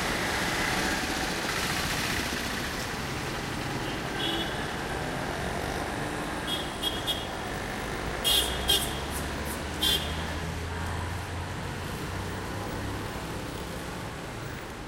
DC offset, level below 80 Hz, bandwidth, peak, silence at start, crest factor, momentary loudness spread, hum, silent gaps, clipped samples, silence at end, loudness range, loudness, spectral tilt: under 0.1%; -42 dBFS; 16 kHz; -12 dBFS; 0 s; 20 dB; 10 LU; none; none; under 0.1%; 0 s; 7 LU; -30 LUFS; -3 dB/octave